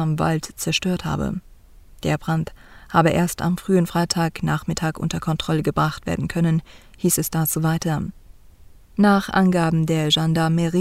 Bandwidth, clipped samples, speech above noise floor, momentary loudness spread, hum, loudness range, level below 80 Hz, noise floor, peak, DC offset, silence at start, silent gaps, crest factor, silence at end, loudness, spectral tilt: 16 kHz; under 0.1%; 26 dB; 8 LU; none; 3 LU; -44 dBFS; -46 dBFS; -4 dBFS; under 0.1%; 0 s; none; 18 dB; 0 s; -21 LUFS; -5 dB/octave